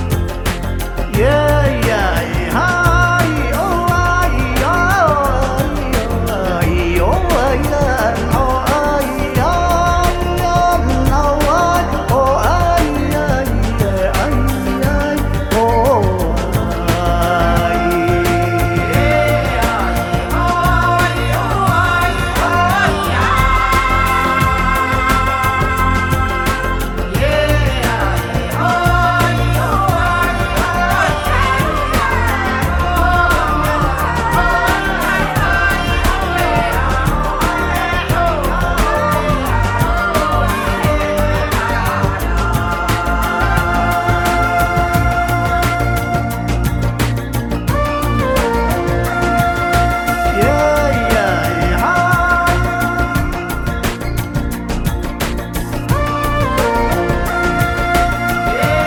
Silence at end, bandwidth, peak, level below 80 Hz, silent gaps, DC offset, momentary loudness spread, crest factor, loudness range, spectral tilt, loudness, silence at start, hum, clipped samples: 0 s; over 20 kHz; 0 dBFS; -22 dBFS; none; under 0.1%; 5 LU; 14 dB; 2 LU; -5.5 dB/octave; -15 LUFS; 0 s; none; under 0.1%